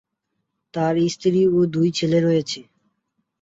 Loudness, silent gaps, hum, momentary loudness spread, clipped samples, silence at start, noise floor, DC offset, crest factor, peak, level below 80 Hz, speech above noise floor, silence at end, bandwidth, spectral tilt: -20 LUFS; none; none; 12 LU; under 0.1%; 0.75 s; -77 dBFS; under 0.1%; 14 dB; -8 dBFS; -60 dBFS; 58 dB; 0.8 s; 8 kHz; -6.5 dB/octave